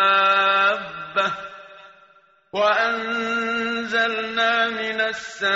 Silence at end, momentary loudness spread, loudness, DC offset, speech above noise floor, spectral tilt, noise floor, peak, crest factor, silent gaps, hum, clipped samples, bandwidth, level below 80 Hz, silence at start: 0 s; 10 LU; -21 LUFS; under 0.1%; 33 dB; 0.5 dB/octave; -55 dBFS; -8 dBFS; 14 dB; none; none; under 0.1%; 8 kHz; -64 dBFS; 0 s